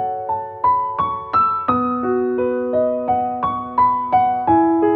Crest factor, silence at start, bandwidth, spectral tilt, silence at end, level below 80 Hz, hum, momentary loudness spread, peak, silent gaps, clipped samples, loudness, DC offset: 14 dB; 0 s; 4.5 kHz; -10 dB/octave; 0 s; -50 dBFS; none; 6 LU; -4 dBFS; none; under 0.1%; -18 LUFS; under 0.1%